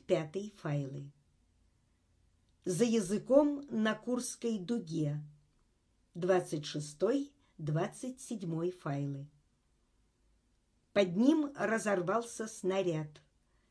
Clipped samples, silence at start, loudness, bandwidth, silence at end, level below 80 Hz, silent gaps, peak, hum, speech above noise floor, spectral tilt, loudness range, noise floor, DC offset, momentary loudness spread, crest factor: under 0.1%; 0.1 s; -34 LUFS; 11 kHz; 0.6 s; -72 dBFS; none; -12 dBFS; none; 41 dB; -6 dB/octave; 5 LU; -74 dBFS; under 0.1%; 15 LU; 22 dB